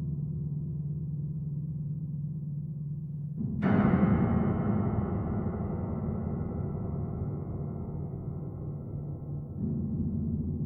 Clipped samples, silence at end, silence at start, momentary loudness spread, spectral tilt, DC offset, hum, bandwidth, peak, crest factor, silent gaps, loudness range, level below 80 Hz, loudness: under 0.1%; 0 s; 0 s; 12 LU; -12.5 dB/octave; under 0.1%; none; 3.7 kHz; -14 dBFS; 18 dB; none; 7 LU; -46 dBFS; -32 LUFS